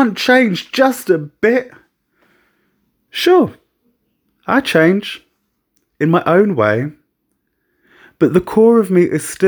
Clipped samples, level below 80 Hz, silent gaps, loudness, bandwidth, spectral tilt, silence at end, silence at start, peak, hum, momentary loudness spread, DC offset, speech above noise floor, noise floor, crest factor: under 0.1%; -54 dBFS; none; -14 LUFS; over 20 kHz; -5.5 dB/octave; 0 s; 0 s; 0 dBFS; none; 9 LU; under 0.1%; 55 dB; -68 dBFS; 16 dB